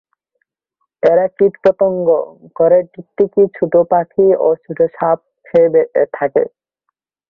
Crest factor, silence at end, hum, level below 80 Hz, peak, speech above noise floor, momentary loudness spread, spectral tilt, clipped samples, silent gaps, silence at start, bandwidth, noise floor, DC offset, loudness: 14 dB; 0.85 s; none; -58 dBFS; 0 dBFS; 60 dB; 6 LU; -9.5 dB/octave; under 0.1%; none; 1.05 s; 4.6 kHz; -74 dBFS; under 0.1%; -14 LUFS